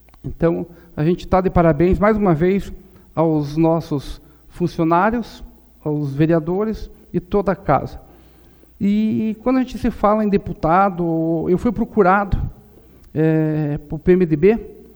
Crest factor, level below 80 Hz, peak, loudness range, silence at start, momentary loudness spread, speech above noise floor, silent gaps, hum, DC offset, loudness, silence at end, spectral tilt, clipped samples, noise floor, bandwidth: 18 dB; -34 dBFS; -2 dBFS; 4 LU; 0.25 s; 11 LU; 30 dB; none; none; under 0.1%; -18 LUFS; 0.15 s; -9 dB/octave; under 0.1%; -48 dBFS; over 20 kHz